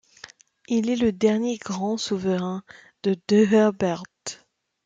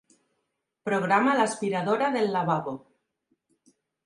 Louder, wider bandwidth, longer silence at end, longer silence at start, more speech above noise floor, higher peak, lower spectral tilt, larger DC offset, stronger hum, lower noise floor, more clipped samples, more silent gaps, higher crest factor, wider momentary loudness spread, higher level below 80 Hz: about the same, -23 LUFS vs -25 LUFS; second, 9.2 kHz vs 11.5 kHz; second, 0.5 s vs 1.25 s; second, 0.7 s vs 0.85 s; second, 38 dB vs 55 dB; about the same, -8 dBFS vs -8 dBFS; about the same, -5.5 dB/octave vs -5.5 dB/octave; neither; neither; second, -61 dBFS vs -80 dBFS; neither; neither; about the same, 16 dB vs 20 dB; first, 17 LU vs 14 LU; first, -62 dBFS vs -76 dBFS